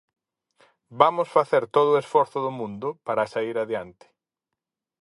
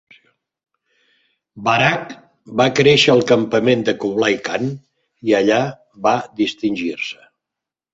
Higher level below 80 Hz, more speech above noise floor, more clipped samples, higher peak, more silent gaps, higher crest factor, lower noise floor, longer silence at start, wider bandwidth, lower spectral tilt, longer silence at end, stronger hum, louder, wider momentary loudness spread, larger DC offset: second, -70 dBFS vs -58 dBFS; second, 63 dB vs 68 dB; neither; about the same, 0 dBFS vs -2 dBFS; neither; first, 24 dB vs 16 dB; about the same, -86 dBFS vs -85 dBFS; second, 0.9 s vs 1.55 s; first, 11.5 kHz vs 8 kHz; about the same, -6 dB/octave vs -5 dB/octave; first, 1.15 s vs 0.8 s; neither; second, -23 LUFS vs -17 LUFS; second, 11 LU vs 14 LU; neither